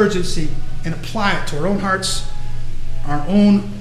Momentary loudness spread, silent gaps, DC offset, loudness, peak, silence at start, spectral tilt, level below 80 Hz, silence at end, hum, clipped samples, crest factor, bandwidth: 17 LU; none; under 0.1%; -19 LUFS; -2 dBFS; 0 s; -5 dB/octave; -24 dBFS; 0 s; none; under 0.1%; 14 dB; 12 kHz